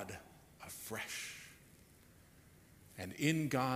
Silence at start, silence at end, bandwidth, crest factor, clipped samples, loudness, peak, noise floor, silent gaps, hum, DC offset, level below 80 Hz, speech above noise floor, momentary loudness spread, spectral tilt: 0 s; 0 s; 15.5 kHz; 24 dB; under 0.1%; -40 LUFS; -18 dBFS; -64 dBFS; none; none; under 0.1%; -70 dBFS; 26 dB; 26 LU; -4.5 dB/octave